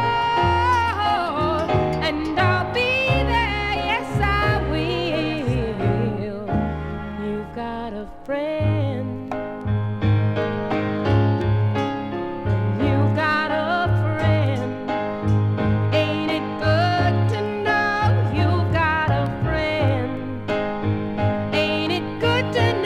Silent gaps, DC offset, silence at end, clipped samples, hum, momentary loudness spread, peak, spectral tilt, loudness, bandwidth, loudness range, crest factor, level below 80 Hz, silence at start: none; under 0.1%; 0 s; under 0.1%; none; 8 LU; -6 dBFS; -7 dB/octave; -21 LUFS; 9 kHz; 5 LU; 14 dB; -36 dBFS; 0 s